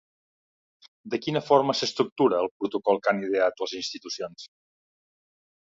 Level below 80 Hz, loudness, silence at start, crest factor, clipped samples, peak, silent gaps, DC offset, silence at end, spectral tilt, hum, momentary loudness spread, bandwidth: -72 dBFS; -26 LUFS; 1.05 s; 22 dB; under 0.1%; -6 dBFS; 2.12-2.16 s, 2.51-2.60 s; under 0.1%; 1.15 s; -4.5 dB/octave; none; 12 LU; 7.8 kHz